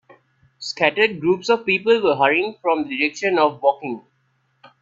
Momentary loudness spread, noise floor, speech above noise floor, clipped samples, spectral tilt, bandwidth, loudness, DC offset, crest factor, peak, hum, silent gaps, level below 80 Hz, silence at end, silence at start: 13 LU; -66 dBFS; 47 dB; under 0.1%; -4.5 dB/octave; 7.8 kHz; -19 LUFS; under 0.1%; 20 dB; 0 dBFS; none; none; -66 dBFS; 0.85 s; 0.6 s